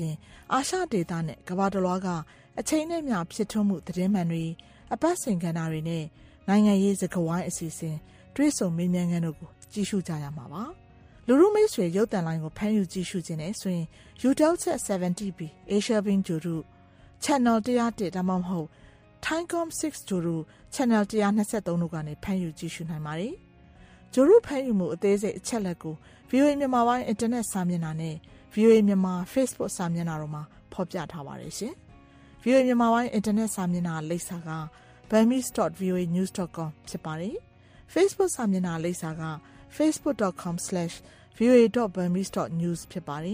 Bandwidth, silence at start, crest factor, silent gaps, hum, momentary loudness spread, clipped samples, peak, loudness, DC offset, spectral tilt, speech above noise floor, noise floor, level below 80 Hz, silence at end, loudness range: 15.5 kHz; 0 s; 18 dB; none; none; 14 LU; under 0.1%; -8 dBFS; -27 LUFS; under 0.1%; -6 dB/octave; 26 dB; -53 dBFS; -58 dBFS; 0 s; 4 LU